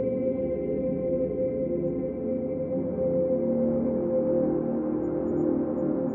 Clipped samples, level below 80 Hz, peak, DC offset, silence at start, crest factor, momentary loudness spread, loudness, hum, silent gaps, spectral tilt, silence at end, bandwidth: under 0.1%; -52 dBFS; -14 dBFS; under 0.1%; 0 s; 12 dB; 4 LU; -27 LUFS; none; none; -13 dB/octave; 0 s; 2.8 kHz